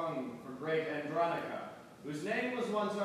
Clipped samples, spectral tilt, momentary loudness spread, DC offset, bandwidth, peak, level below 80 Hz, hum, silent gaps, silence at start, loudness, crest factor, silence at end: under 0.1%; -5.5 dB/octave; 10 LU; under 0.1%; 14.5 kHz; -20 dBFS; -78 dBFS; none; none; 0 s; -37 LUFS; 16 dB; 0 s